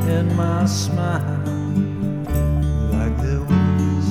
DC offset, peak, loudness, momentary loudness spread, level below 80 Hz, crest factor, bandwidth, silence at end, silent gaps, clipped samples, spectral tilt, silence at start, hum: under 0.1%; -6 dBFS; -20 LUFS; 5 LU; -28 dBFS; 14 dB; 15.5 kHz; 0 s; none; under 0.1%; -7 dB/octave; 0 s; none